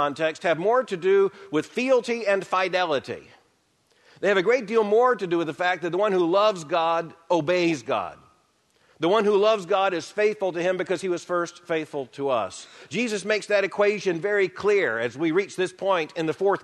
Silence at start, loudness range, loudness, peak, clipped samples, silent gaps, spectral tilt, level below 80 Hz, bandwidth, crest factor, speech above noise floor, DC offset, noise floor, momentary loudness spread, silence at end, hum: 0 s; 3 LU; -24 LUFS; -8 dBFS; under 0.1%; none; -5 dB/octave; -72 dBFS; 11.5 kHz; 16 dB; 42 dB; under 0.1%; -66 dBFS; 8 LU; 0 s; none